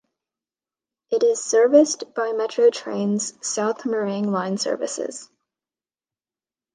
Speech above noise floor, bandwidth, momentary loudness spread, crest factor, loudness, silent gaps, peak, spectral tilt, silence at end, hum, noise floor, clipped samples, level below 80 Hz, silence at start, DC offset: over 69 dB; 10 kHz; 11 LU; 20 dB; -21 LUFS; none; -4 dBFS; -4 dB/octave; 1.5 s; none; under -90 dBFS; under 0.1%; -78 dBFS; 1.1 s; under 0.1%